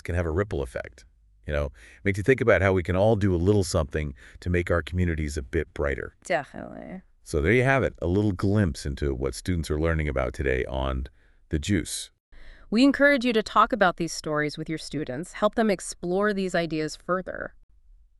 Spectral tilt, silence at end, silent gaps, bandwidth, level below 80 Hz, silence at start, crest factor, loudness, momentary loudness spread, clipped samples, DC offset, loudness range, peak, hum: -6 dB/octave; 0.7 s; 12.20-12.32 s; 12 kHz; -38 dBFS; 0.1 s; 20 dB; -25 LUFS; 14 LU; under 0.1%; under 0.1%; 5 LU; -6 dBFS; none